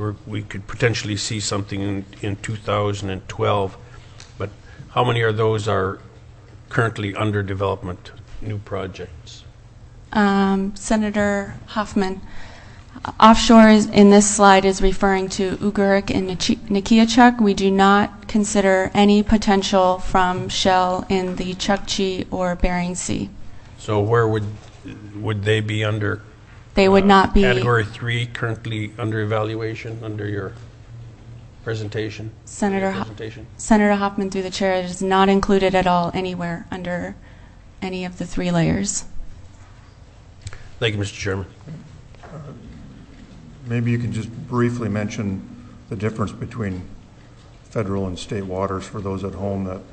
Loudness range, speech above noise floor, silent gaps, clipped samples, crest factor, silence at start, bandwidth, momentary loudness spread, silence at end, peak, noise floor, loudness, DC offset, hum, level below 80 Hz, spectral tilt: 13 LU; 25 dB; none; under 0.1%; 20 dB; 0 s; 8.6 kHz; 20 LU; 0 s; 0 dBFS; -44 dBFS; -19 LUFS; under 0.1%; none; -36 dBFS; -5 dB/octave